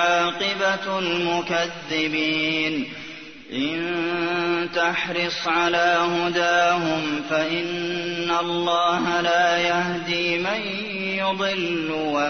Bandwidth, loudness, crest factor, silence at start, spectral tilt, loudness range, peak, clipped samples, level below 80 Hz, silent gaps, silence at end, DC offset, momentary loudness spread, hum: 6.6 kHz; -22 LUFS; 16 dB; 0 s; -4 dB/octave; 3 LU; -6 dBFS; under 0.1%; -62 dBFS; none; 0 s; 0.2%; 7 LU; none